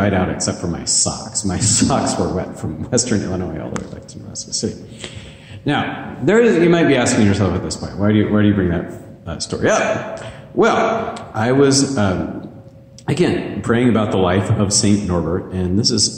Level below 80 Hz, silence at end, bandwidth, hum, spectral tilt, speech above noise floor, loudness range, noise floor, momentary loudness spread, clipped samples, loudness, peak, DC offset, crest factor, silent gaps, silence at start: -42 dBFS; 0 s; 14 kHz; none; -4.5 dB/octave; 23 dB; 6 LU; -40 dBFS; 16 LU; under 0.1%; -17 LUFS; -2 dBFS; under 0.1%; 16 dB; none; 0 s